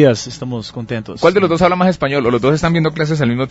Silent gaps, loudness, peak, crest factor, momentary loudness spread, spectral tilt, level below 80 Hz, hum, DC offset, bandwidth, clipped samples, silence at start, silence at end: none; -15 LUFS; 0 dBFS; 14 dB; 12 LU; -6.5 dB/octave; -42 dBFS; none; under 0.1%; 8 kHz; under 0.1%; 0 s; 0 s